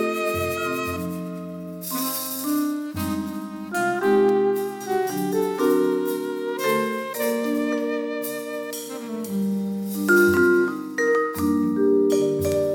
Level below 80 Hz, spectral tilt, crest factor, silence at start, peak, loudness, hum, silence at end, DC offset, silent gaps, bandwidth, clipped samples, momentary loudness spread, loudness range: -56 dBFS; -5 dB/octave; 16 dB; 0 s; -8 dBFS; -23 LUFS; none; 0 s; under 0.1%; none; 19 kHz; under 0.1%; 12 LU; 6 LU